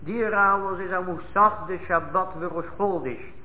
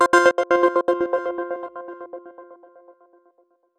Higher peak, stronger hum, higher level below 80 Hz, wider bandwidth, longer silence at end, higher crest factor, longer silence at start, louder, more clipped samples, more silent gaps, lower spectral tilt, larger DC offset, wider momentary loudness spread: second, -8 dBFS vs -2 dBFS; neither; first, -52 dBFS vs -64 dBFS; second, 4 kHz vs 12 kHz; second, 0 s vs 1.25 s; about the same, 16 dB vs 20 dB; about the same, 0 s vs 0 s; second, -24 LUFS vs -20 LUFS; neither; neither; first, -10 dB/octave vs -3 dB/octave; first, 1% vs under 0.1%; second, 11 LU vs 21 LU